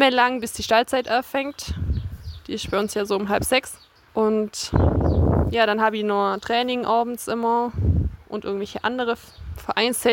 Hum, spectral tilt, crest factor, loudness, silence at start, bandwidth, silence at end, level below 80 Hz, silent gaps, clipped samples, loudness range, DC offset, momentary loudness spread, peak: none; -5 dB/octave; 18 dB; -23 LUFS; 0 s; 17 kHz; 0 s; -34 dBFS; none; under 0.1%; 4 LU; under 0.1%; 11 LU; -4 dBFS